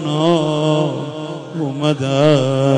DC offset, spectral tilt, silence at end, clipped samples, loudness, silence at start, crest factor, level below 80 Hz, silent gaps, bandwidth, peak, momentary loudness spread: under 0.1%; -6.5 dB/octave; 0 s; under 0.1%; -17 LUFS; 0 s; 14 dB; -60 dBFS; none; 10 kHz; -2 dBFS; 12 LU